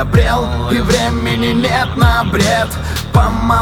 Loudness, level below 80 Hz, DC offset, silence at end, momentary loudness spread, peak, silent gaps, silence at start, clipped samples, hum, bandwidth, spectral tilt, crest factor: -14 LUFS; -20 dBFS; under 0.1%; 0 s; 4 LU; 0 dBFS; none; 0 s; under 0.1%; none; 19 kHz; -5.5 dB/octave; 12 dB